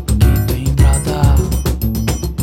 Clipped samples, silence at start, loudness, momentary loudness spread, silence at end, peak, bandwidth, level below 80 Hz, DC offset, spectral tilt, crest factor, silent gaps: under 0.1%; 0 s; -15 LUFS; 5 LU; 0 s; 0 dBFS; 17 kHz; -16 dBFS; under 0.1%; -6 dB/octave; 12 dB; none